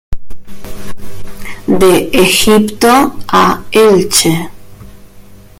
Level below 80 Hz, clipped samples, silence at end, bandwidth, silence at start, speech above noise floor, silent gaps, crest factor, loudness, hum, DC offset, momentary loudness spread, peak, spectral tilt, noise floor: -30 dBFS; 0.3%; 0.25 s; over 20 kHz; 0.1 s; 26 dB; none; 10 dB; -9 LUFS; none; under 0.1%; 22 LU; 0 dBFS; -4 dB/octave; -35 dBFS